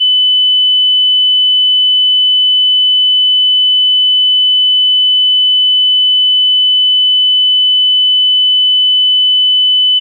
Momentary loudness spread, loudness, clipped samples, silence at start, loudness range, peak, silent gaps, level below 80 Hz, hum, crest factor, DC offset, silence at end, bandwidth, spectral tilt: 0 LU; -6 LUFS; under 0.1%; 0 s; 0 LU; -6 dBFS; none; under -90 dBFS; none; 4 dB; under 0.1%; 0 s; 3.4 kHz; 17.5 dB/octave